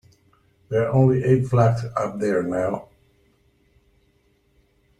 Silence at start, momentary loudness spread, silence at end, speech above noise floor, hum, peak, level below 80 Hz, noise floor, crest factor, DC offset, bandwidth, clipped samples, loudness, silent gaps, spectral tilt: 0.7 s; 9 LU; 2.15 s; 43 dB; none; -4 dBFS; -54 dBFS; -63 dBFS; 20 dB; under 0.1%; 9.8 kHz; under 0.1%; -21 LUFS; none; -9 dB/octave